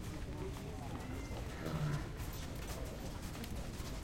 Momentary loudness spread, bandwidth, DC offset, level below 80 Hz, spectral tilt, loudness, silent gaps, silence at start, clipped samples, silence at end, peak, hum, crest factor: 6 LU; 16.5 kHz; under 0.1%; -48 dBFS; -5.5 dB/octave; -44 LUFS; none; 0 s; under 0.1%; 0 s; -28 dBFS; none; 14 dB